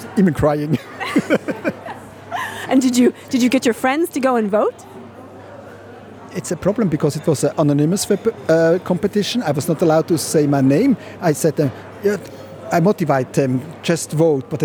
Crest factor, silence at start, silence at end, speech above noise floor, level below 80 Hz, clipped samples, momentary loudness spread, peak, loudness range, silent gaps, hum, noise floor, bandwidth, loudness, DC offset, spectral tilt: 16 dB; 0 s; 0 s; 21 dB; -50 dBFS; under 0.1%; 20 LU; -2 dBFS; 5 LU; none; none; -37 dBFS; over 20 kHz; -18 LUFS; under 0.1%; -6 dB/octave